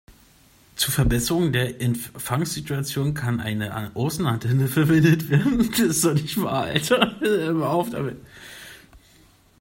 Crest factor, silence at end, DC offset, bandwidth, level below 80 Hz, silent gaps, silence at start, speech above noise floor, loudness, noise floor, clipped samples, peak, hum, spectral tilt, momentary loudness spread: 20 dB; 0.65 s; under 0.1%; 16.5 kHz; -42 dBFS; none; 0.1 s; 33 dB; -22 LUFS; -55 dBFS; under 0.1%; -2 dBFS; none; -5 dB/octave; 11 LU